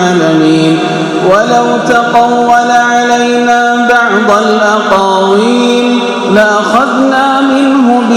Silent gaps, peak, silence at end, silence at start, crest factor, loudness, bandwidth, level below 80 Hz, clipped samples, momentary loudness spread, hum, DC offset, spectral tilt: none; 0 dBFS; 0 s; 0 s; 8 dB; -8 LUFS; 13.5 kHz; -48 dBFS; 2%; 2 LU; none; under 0.1%; -4.5 dB/octave